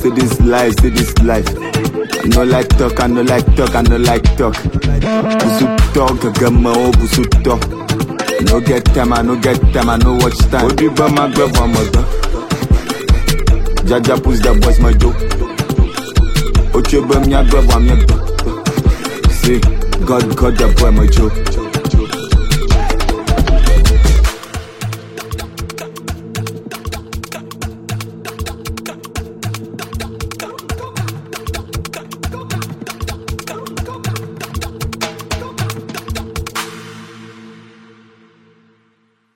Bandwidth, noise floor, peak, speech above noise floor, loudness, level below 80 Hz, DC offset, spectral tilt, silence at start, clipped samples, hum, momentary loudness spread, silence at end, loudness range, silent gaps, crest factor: 16.5 kHz; -58 dBFS; 0 dBFS; 48 dB; -14 LUFS; -16 dBFS; under 0.1%; -5.5 dB/octave; 0 s; under 0.1%; none; 14 LU; 1.8 s; 12 LU; none; 12 dB